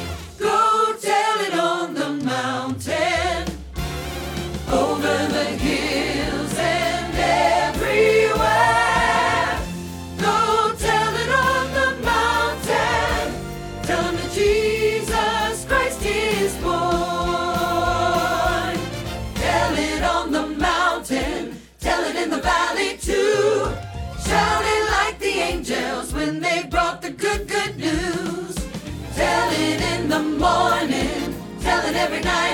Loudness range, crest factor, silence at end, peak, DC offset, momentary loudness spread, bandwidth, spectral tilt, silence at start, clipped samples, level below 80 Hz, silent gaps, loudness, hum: 5 LU; 16 dB; 0 s; -6 dBFS; under 0.1%; 10 LU; 19 kHz; -4 dB/octave; 0 s; under 0.1%; -36 dBFS; none; -21 LUFS; none